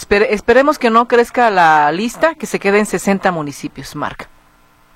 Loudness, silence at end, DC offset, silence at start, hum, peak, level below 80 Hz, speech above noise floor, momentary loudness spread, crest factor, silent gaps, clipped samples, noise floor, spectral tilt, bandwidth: -13 LUFS; 0.7 s; under 0.1%; 0 s; none; 0 dBFS; -44 dBFS; 36 dB; 14 LU; 14 dB; none; under 0.1%; -50 dBFS; -4.5 dB/octave; 16 kHz